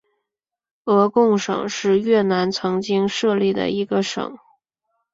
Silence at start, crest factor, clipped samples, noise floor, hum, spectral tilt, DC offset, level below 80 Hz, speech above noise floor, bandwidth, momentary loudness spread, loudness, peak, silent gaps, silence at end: 0.85 s; 18 dB; under 0.1%; -84 dBFS; none; -5.5 dB/octave; under 0.1%; -62 dBFS; 65 dB; 7.8 kHz; 7 LU; -19 LUFS; -2 dBFS; none; 0.8 s